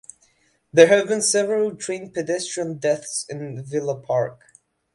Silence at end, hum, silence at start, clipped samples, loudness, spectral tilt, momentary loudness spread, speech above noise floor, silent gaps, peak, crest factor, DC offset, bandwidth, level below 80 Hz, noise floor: 0.6 s; none; 0.75 s; under 0.1%; -21 LUFS; -3.5 dB/octave; 14 LU; 42 dB; none; 0 dBFS; 22 dB; under 0.1%; 11.5 kHz; -68 dBFS; -63 dBFS